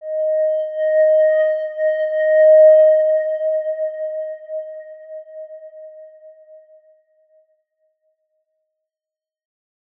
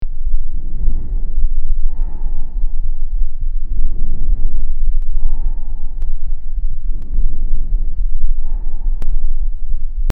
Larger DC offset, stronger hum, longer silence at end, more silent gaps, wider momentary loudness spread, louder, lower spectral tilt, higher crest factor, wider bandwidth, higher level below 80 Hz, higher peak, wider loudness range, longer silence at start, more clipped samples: neither; neither; first, 3.7 s vs 0 s; neither; first, 26 LU vs 4 LU; first, -16 LUFS vs -25 LUFS; second, -2 dB/octave vs -9.5 dB/octave; first, 14 dB vs 8 dB; first, 3.3 kHz vs 0.4 kHz; second, under -90 dBFS vs -14 dBFS; second, -4 dBFS vs 0 dBFS; first, 19 LU vs 1 LU; about the same, 0 s vs 0 s; neither